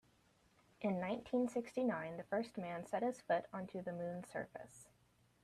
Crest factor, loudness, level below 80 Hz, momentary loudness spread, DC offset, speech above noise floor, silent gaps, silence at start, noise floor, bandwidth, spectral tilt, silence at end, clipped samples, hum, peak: 18 dB; -42 LUFS; -78 dBFS; 9 LU; under 0.1%; 32 dB; none; 0.8 s; -74 dBFS; 13.5 kHz; -6.5 dB/octave; 0.6 s; under 0.1%; none; -26 dBFS